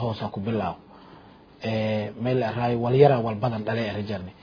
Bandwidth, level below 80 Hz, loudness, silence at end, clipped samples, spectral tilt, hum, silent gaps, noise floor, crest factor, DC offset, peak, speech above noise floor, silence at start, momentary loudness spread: 5.4 kHz; -56 dBFS; -25 LUFS; 0.1 s; under 0.1%; -9 dB/octave; none; none; -49 dBFS; 20 dB; under 0.1%; -4 dBFS; 25 dB; 0 s; 13 LU